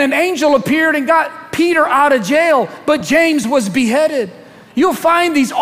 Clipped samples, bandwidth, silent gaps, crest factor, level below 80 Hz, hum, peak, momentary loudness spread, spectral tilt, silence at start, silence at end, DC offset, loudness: under 0.1%; 16 kHz; none; 14 dB; -54 dBFS; none; 0 dBFS; 5 LU; -4 dB/octave; 0 s; 0 s; under 0.1%; -13 LUFS